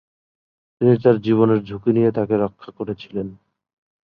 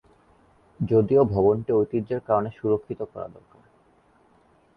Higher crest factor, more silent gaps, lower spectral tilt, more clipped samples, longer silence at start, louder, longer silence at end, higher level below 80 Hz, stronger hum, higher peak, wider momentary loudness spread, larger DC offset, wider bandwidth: about the same, 18 dB vs 18 dB; neither; about the same, -10.5 dB/octave vs -11.5 dB/octave; neither; about the same, 0.8 s vs 0.8 s; first, -19 LUFS vs -23 LUFS; second, 0.7 s vs 1.45 s; about the same, -56 dBFS vs -52 dBFS; neither; first, -2 dBFS vs -6 dBFS; about the same, 13 LU vs 15 LU; neither; about the same, 5.2 kHz vs 5 kHz